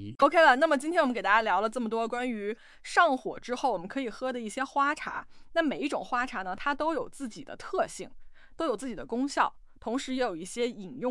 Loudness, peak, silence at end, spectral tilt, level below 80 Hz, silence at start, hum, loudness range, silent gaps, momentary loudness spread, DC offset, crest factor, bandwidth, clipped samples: -29 LUFS; -8 dBFS; 0 s; -3.5 dB/octave; -58 dBFS; 0 s; none; 7 LU; none; 12 LU; under 0.1%; 22 dB; 12 kHz; under 0.1%